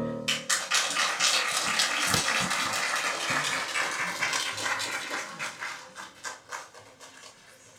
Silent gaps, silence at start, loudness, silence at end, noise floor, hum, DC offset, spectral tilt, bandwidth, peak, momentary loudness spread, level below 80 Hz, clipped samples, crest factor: none; 0 s; -27 LUFS; 0 s; -53 dBFS; none; under 0.1%; -0.5 dB/octave; over 20 kHz; -6 dBFS; 16 LU; -66 dBFS; under 0.1%; 24 dB